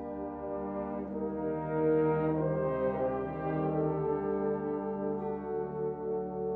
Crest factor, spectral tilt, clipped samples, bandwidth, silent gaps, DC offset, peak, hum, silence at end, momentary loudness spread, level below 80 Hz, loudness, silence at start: 14 dB; -12 dB/octave; under 0.1%; 4 kHz; none; under 0.1%; -18 dBFS; 50 Hz at -55 dBFS; 0 s; 8 LU; -56 dBFS; -33 LUFS; 0 s